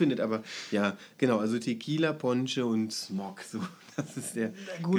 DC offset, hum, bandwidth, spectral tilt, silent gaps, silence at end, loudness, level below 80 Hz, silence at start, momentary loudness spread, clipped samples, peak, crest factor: under 0.1%; none; 14.5 kHz; -5.5 dB/octave; none; 0 s; -31 LUFS; -84 dBFS; 0 s; 10 LU; under 0.1%; -12 dBFS; 18 dB